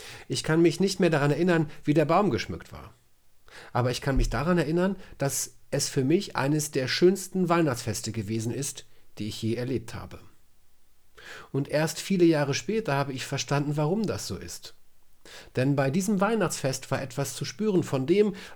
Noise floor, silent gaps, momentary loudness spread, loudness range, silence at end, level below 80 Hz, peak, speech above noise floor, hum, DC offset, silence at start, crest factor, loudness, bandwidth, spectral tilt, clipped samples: -54 dBFS; none; 13 LU; 6 LU; 0 s; -44 dBFS; -10 dBFS; 28 dB; none; under 0.1%; 0 s; 16 dB; -27 LUFS; over 20 kHz; -5.5 dB/octave; under 0.1%